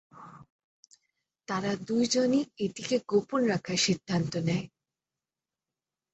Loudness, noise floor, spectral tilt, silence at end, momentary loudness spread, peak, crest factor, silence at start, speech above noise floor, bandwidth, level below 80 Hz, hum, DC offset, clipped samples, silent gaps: -29 LUFS; under -90 dBFS; -4.5 dB/octave; 1.45 s; 8 LU; -14 dBFS; 18 dB; 0.15 s; over 62 dB; 8.4 kHz; -66 dBFS; none; under 0.1%; under 0.1%; 0.50-0.83 s